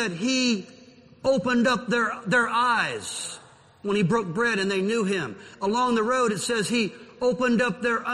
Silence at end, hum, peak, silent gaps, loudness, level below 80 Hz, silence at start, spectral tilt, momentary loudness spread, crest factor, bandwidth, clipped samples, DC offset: 0 s; none; -10 dBFS; none; -24 LUFS; -60 dBFS; 0 s; -4 dB/octave; 9 LU; 16 dB; 12.5 kHz; under 0.1%; under 0.1%